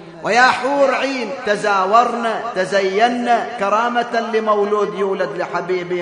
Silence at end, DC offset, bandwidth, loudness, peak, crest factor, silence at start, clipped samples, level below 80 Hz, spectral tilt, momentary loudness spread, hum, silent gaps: 0 s; under 0.1%; 10 kHz; -17 LUFS; 0 dBFS; 16 dB; 0 s; under 0.1%; -64 dBFS; -4 dB/octave; 8 LU; none; none